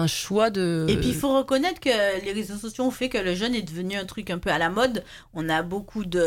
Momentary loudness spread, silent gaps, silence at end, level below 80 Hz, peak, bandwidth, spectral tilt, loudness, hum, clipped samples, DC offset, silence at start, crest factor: 9 LU; none; 0 s; -46 dBFS; -8 dBFS; 17.5 kHz; -5 dB/octave; -25 LUFS; none; under 0.1%; under 0.1%; 0 s; 16 dB